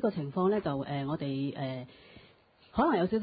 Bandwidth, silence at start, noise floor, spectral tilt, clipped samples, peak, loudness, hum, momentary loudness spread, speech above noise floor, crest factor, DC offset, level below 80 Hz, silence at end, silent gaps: 5 kHz; 0 s; -61 dBFS; -11 dB/octave; under 0.1%; -14 dBFS; -32 LUFS; none; 10 LU; 31 dB; 18 dB; under 0.1%; -58 dBFS; 0 s; none